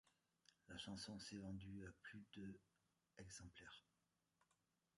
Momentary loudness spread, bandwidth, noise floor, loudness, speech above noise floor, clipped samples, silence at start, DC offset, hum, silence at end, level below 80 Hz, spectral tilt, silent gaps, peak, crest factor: 11 LU; 11 kHz; -89 dBFS; -57 LUFS; 32 dB; under 0.1%; 0.05 s; under 0.1%; none; 1.2 s; -76 dBFS; -4 dB/octave; none; -40 dBFS; 20 dB